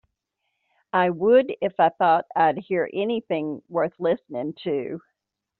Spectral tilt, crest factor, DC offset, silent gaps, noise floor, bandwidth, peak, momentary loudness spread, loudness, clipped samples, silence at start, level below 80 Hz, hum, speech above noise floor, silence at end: -4 dB/octave; 18 dB; under 0.1%; none; -80 dBFS; 4.4 kHz; -6 dBFS; 10 LU; -23 LUFS; under 0.1%; 0.95 s; -70 dBFS; none; 58 dB; 0.6 s